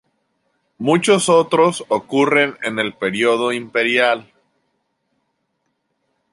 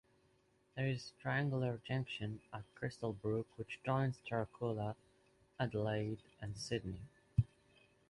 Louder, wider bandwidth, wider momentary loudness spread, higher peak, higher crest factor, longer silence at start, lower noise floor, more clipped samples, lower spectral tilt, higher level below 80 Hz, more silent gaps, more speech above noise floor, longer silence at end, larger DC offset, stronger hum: first, -17 LUFS vs -41 LUFS; about the same, 11.5 kHz vs 11.5 kHz; second, 8 LU vs 11 LU; first, -2 dBFS vs -20 dBFS; about the same, 18 dB vs 22 dB; about the same, 0.8 s vs 0.75 s; about the same, -71 dBFS vs -74 dBFS; neither; second, -4 dB/octave vs -6.5 dB/octave; second, -66 dBFS vs -60 dBFS; neither; first, 54 dB vs 34 dB; first, 2.1 s vs 0.65 s; neither; neither